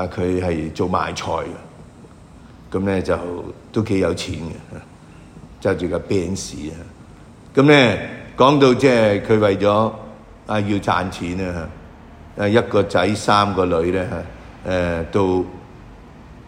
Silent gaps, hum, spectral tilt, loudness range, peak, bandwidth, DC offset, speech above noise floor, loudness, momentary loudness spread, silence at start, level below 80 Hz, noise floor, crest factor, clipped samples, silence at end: none; none; -6 dB/octave; 9 LU; 0 dBFS; 15.5 kHz; under 0.1%; 24 dB; -19 LUFS; 19 LU; 0 s; -44 dBFS; -43 dBFS; 20 dB; under 0.1%; 0 s